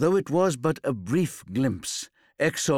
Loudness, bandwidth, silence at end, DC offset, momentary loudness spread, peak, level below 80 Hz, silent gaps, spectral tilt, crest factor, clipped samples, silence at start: -26 LUFS; 17 kHz; 0 s; under 0.1%; 9 LU; -10 dBFS; -60 dBFS; none; -5 dB/octave; 14 dB; under 0.1%; 0 s